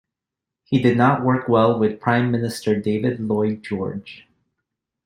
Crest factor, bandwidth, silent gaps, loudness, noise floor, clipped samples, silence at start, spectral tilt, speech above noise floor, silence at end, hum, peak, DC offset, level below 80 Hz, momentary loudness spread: 18 dB; 16 kHz; none; -20 LUFS; -86 dBFS; under 0.1%; 0.7 s; -7.5 dB/octave; 66 dB; 0.9 s; none; -2 dBFS; under 0.1%; -58 dBFS; 10 LU